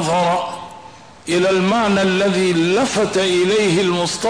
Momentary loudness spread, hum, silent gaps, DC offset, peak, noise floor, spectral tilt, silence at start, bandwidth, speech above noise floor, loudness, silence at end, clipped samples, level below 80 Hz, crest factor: 9 LU; none; none; 0.3%; -8 dBFS; -40 dBFS; -4.5 dB/octave; 0 s; 11 kHz; 24 dB; -16 LUFS; 0 s; under 0.1%; -52 dBFS; 10 dB